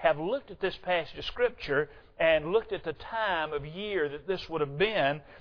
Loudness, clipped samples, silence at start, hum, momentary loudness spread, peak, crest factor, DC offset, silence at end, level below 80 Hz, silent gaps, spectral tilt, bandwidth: -30 LUFS; under 0.1%; 0 s; none; 9 LU; -10 dBFS; 20 dB; under 0.1%; 0 s; -54 dBFS; none; -6.5 dB/octave; 5.4 kHz